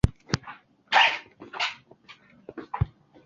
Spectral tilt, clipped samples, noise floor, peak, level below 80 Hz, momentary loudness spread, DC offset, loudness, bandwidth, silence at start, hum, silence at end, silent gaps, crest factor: -4 dB/octave; under 0.1%; -53 dBFS; -4 dBFS; -40 dBFS; 24 LU; under 0.1%; -26 LUFS; 11.5 kHz; 0.05 s; none; 0.4 s; none; 24 dB